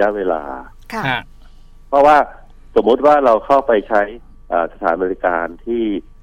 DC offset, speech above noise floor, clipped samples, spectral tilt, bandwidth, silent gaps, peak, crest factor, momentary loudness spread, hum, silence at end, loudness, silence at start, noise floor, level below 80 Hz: under 0.1%; 24 dB; under 0.1%; -6 dB/octave; 10.5 kHz; none; -2 dBFS; 14 dB; 12 LU; none; 0.2 s; -16 LUFS; 0 s; -40 dBFS; -40 dBFS